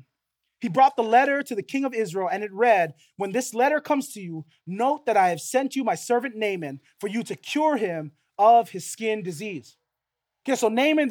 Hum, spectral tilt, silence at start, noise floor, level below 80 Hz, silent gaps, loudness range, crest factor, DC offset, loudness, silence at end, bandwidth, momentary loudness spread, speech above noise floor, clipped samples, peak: none; -4.5 dB/octave; 0.6 s; -84 dBFS; -82 dBFS; none; 3 LU; 18 dB; under 0.1%; -24 LUFS; 0 s; 18 kHz; 15 LU; 61 dB; under 0.1%; -6 dBFS